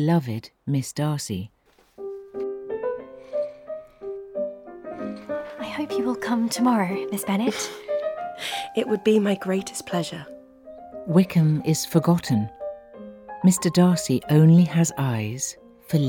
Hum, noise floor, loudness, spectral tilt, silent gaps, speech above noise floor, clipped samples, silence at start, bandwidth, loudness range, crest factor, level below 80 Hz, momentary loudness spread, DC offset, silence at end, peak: none; -45 dBFS; -24 LUFS; -6 dB/octave; none; 23 dB; under 0.1%; 0 s; 18.5 kHz; 12 LU; 18 dB; -60 dBFS; 18 LU; under 0.1%; 0 s; -6 dBFS